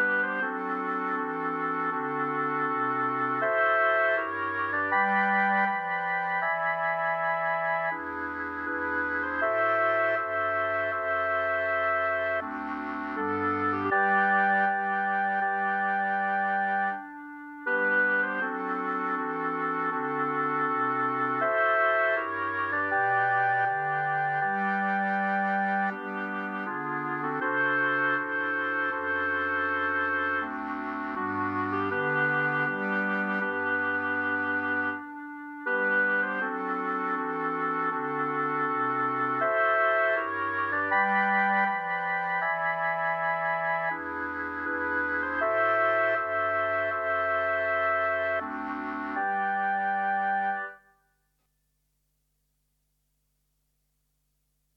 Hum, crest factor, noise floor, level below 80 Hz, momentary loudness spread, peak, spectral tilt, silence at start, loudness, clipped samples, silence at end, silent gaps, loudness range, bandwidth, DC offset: 50 Hz at -75 dBFS; 16 dB; -75 dBFS; -70 dBFS; 8 LU; -12 dBFS; -7 dB/octave; 0 s; -27 LUFS; under 0.1%; 4 s; none; 3 LU; 6.2 kHz; under 0.1%